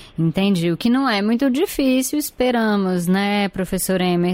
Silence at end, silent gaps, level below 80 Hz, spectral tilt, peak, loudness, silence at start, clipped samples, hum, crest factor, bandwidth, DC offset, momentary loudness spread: 0 s; none; -46 dBFS; -5.5 dB/octave; -8 dBFS; -19 LUFS; 0 s; under 0.1%; none; 12 dB; 16.5 kHz; under 0.1%; 3 LU